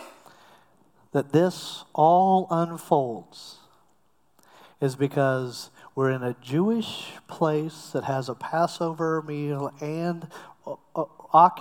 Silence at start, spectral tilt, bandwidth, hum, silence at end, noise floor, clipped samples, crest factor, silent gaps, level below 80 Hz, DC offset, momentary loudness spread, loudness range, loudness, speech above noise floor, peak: 0 s; -6.5 dB/octave; 18 kHz; none; 0 s; -68 dBFS; under 0.1%; 22 dB; none; -76 dBFS; under 0.1%; 18 LU; 5 LU; -25 LUFS; 43 dB; -4 dBFS